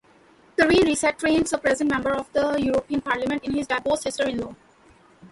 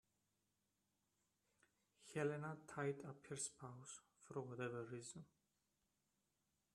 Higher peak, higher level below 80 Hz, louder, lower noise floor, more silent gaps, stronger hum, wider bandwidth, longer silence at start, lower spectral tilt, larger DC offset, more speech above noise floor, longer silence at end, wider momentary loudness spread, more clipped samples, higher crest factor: first, -6 dBFS vs -30 dBFS; first, -50 dBFS vs -88 dBFS; first, -23 LUFS vs -50 LUFS; second, -55 dBFS vs -88 dBFS; neither; neither; second, 11.5 kHz vs 13 kHz; second, 0.6 s vs 2 s; about the same, -4 dB/octave vs -5 dB/octave; neither; second, 32 dB vs 39 dB; second, 0.05 s vs 1.5 s; second, 8 LU vs 14 LU; neither; second, 16 dB vs 22 dB